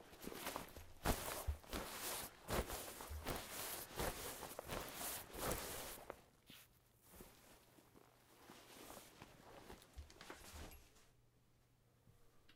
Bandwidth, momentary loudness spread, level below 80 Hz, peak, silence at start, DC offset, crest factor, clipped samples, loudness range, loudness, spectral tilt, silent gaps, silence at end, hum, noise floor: 16 kHz; 21 LU; -58 dBFS; -24 dBFS; 0 s; under 0.1%; 26 dB; under 0.1%; 15 LU; -48 LUFS; -3 dB/octave; none; 0 s; none; -74 dBFS